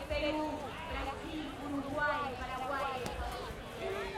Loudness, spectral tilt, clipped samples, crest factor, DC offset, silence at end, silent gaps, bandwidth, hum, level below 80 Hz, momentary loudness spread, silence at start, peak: -38 LUFS; -5 dB/octave; under 0.1%; 20 dB; under 0.1%; 0 s; none; 16.5 kHz; none; -50 dBFS; 7 LU; 0 s; -18 dBFS